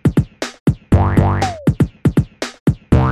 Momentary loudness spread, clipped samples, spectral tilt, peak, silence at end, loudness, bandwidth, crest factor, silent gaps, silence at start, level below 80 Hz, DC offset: 6 LU; under 0.1%; -7.5 dB/octave; 0 dBFS; 0 s; -17 LUFS; 13 kHz; 16 dB; 0.60-0.66 s, 2.60-2.66 s; 0.05 s; -26 dBFS; under 0.1%